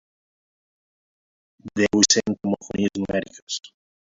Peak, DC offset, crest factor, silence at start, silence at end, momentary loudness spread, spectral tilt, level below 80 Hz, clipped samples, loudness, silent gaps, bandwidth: 0 dBFS; under 0.1%; 24 dB; 1.65 s; 0.45 s; 15 LU; -3 dB/octave; -56 dBFS; under 0.1%; -22 LUFS; 3.42-3.47 s; 8 kHz